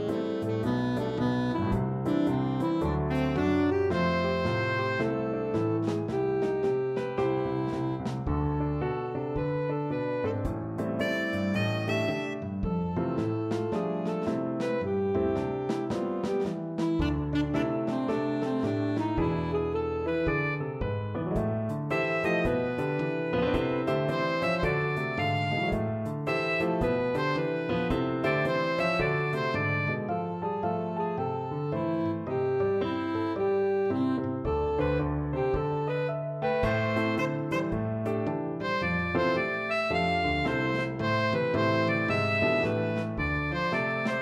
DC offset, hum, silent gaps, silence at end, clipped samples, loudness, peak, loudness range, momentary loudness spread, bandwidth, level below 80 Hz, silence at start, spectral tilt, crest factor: under 0.1%; none; none; 0 s; under 0.1%; -29 LUFS; -14 dBFS; 3 LU; 4 LU; 13.5 kHz; -46 dBFS; 0 s; -7.5 dB/octave; 14 dB